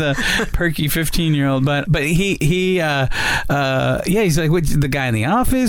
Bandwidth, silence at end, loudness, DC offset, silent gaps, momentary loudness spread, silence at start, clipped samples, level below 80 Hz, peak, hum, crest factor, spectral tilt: 19.5 kHz; 0 s; -17 LUFS; 0.3%; none; 2 LU; 0 s; under 0.1%; -28 dBFS; -6 dBFS; none; 10 dB; -5 dB/octave